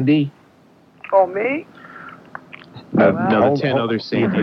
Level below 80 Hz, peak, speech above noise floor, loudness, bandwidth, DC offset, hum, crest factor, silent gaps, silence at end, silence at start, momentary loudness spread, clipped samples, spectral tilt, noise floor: -58 dBFS; -2 dBFS; 34 dB; -18 LUFS; 6.2 kHz; under 0.1%; none; 18 dB; none; 0 s; 0 s; 22 LU; under 0.1%; -8.5 dB/octave; -51 dBFS